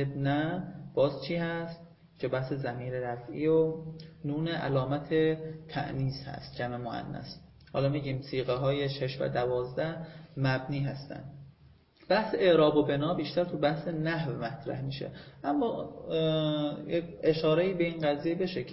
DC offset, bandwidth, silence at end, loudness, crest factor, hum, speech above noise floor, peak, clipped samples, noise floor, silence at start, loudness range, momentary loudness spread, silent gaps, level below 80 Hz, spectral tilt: under 0.1%; 5.8 kHz; 0 s; -31 LUFS; 18 dB; none; 29 dB; -12 dBFS; under 0.1%; -60 dBFS; 0 s; 5 LU; 13 LU; none; -60 dBFS; -10.5 dB/octave